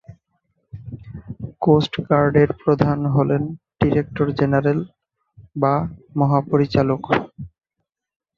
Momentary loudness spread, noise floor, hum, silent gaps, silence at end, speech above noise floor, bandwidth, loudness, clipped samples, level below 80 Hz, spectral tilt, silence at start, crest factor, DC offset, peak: 19 LU; -79 dBFS; none; none; 0.9 s; 61 dB; 6.8 kHz; -19 LUFS; under 0.1%; -46 dBFS; -9 dB/octave; 0.1 s; 18 dB; under 0.1%; -2 dBFS